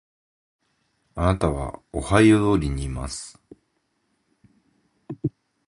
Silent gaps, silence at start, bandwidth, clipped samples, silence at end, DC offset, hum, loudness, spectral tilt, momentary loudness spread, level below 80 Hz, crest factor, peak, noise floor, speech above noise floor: none; 1.15 s; 11.5 kHz; under 0.1%; 0.4 s; under 0.1%; none; -23 LUFS; -6.5 dB/octave; 19 LU; -38 dBFS; 24 dB; -2 dBFS; -72 dBFS; 50 dB